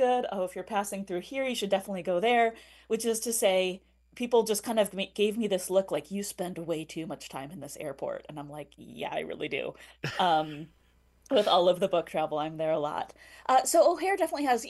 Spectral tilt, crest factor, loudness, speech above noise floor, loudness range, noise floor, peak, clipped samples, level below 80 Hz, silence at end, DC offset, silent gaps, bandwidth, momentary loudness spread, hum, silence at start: -3.5 dB/octave; 18 dB; -29 LUFS; 33 dB; 10 LU; -62 dBFS; -12 dBFS; under 0.1%; -66 dBFS; 0 s; under 0.1%; none; 13 kHz; 15 LU; none; 0 s